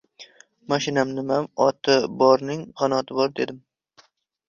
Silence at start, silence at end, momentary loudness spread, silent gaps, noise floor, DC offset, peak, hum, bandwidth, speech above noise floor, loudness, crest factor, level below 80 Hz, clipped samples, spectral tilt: 0.2 s; 0.9 s; 8 LU; none; -59 dBFS; under 0.1%; -4 dBFS; none; 7.4 kHz; 37 dB; -22 LUFS; 20 dB; -66 dBFS; under 0.1%; -5 dB/octave